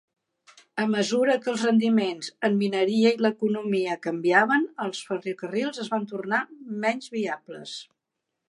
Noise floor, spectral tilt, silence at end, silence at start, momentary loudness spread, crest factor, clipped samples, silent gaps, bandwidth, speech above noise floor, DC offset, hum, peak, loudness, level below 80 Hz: -83 dBFS; -5 dB/octave; 0.65 s; 0.75 s; 11 LU; 22 dB; under 0.1%; none; 11 kHz; 58 dB; under 0.1%; none; -4 dBFS; -25 LUFS; -80 dBFS